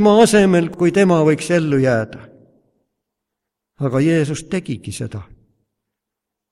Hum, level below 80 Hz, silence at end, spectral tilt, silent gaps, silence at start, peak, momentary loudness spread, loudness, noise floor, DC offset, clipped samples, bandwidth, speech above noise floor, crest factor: none; -50 dBFS; 1.3 s; -6 dB/octave; none; 0 s; 0 dBFS; 16 LU; -16 LUFS; -82 dBFS; under 0.1%; under 0.1%; 14.5 kHz; 67 dB; 18 dB